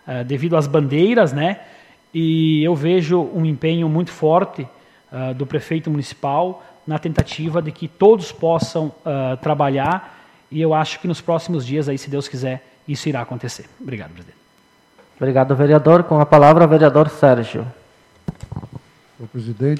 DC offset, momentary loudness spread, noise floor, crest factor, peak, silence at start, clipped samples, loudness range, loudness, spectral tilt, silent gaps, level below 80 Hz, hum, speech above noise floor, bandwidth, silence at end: under 0.1%; 19 LU; -55 dBFS; 18 dB; 0 dBFS; 0.05 s; under 0.1%; 11 LU; -17 LUFS; -7.5 dB/octave; none; -48 dBFS; none; 38 dB; 11 kHz; 0 s